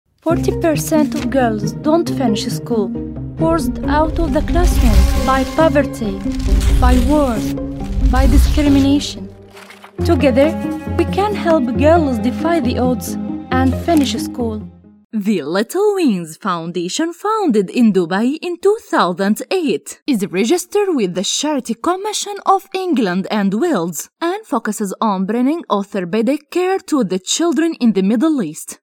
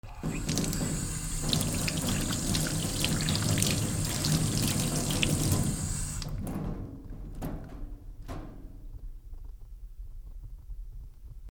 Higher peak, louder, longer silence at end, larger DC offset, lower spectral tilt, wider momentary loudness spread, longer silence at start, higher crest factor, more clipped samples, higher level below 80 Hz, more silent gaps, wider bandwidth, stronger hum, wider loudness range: first, 0 dBFS vs -4 dBFS; first, -16 LUFS vs -30 LUFS; about the same, 0.05 s vs 0 s; neither; first, -5.5 dB/octave vs -4 dB/octave; second, 8 LU vs 21 LU; first, 0.25 s vs 0.05 s; second, 16 dB vs 28 dB; neither; first, -24 dBFS vs -40 dBFS; first, 15.05-15.10 s, 20.02-20.06 s vs none; second, 17 kHz vs over 20 kHz; neither; second, 3 LU vs 19 LU